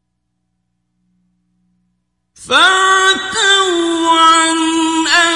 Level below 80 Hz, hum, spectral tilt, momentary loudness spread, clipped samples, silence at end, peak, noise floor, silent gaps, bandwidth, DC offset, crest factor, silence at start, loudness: -54 dBFS; 60 Hz at -60 dBFS; 0 dB/octave; 6 LU; under 0.1%; 0 s; 0 dBFS; -69 dBFS; none; 11.5 kHz; under 0.1%; 14 dB; 2.4 s; -10 LUFS